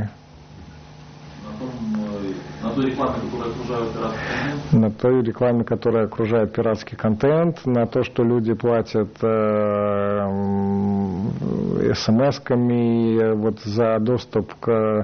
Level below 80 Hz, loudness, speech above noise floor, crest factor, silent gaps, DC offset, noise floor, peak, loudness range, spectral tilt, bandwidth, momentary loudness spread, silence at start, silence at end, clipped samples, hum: -46 dBFS; -21 LUFS; 23 dB; 14 dB; none; under 0.1%; -43 dBFS; -6 dBFS; 6 LU; -8 dB/octave; 6.6 kHz; 8 LU; 0 s; 0 s; under 0.1%; none